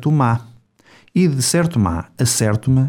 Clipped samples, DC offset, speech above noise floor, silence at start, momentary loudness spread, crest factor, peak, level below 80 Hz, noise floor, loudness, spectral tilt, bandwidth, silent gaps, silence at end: under 0.1%; under 0.1%; 35 dB; 0 s; 5 LU; 14 dB; -4 dBFS; -42 dBFS; -51 dBFS; -17 LUFS; -5.5 dB/octave; 18.5 kHz; none; 0 s